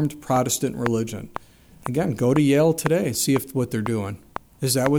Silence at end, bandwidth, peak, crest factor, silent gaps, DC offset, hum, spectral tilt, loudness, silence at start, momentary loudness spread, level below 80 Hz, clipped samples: 0 s; over 20 kHz; -2 dBFS; 22 dB; none; under 0.1%; none; -5 dB/octave; -22 LUFS; 0 s; 17 LU; -52 dBFS; under 0.1%